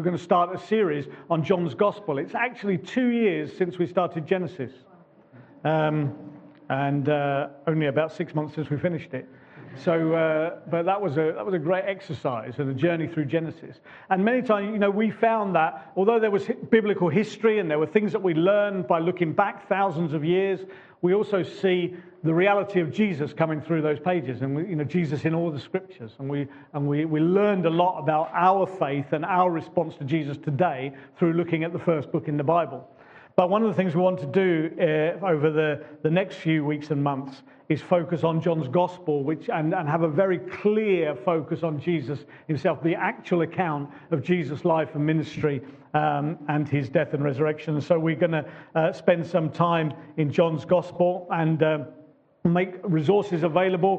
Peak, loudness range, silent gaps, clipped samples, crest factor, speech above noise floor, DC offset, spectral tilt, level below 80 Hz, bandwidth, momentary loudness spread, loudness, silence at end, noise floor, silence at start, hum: -4 dBFS; 4 LU; none; under 0.1%; 20 dB; 28 dB; under 0.1%; -8.5 dB/octave; -70 dBFS; 8 kHz; 8 LU; -25 LUFS; 0 s; -52 dBFS; 0 s; none